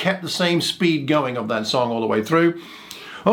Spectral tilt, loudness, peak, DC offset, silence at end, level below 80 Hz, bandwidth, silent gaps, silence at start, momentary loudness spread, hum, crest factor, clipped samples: -5 dB/octave; -20 LUFS; -2 dBFS; under 0.1%; 0 s; -66 dBFS; 17 kHz; none; 0 s; 16 LU; none; 18 dB; under 0.1%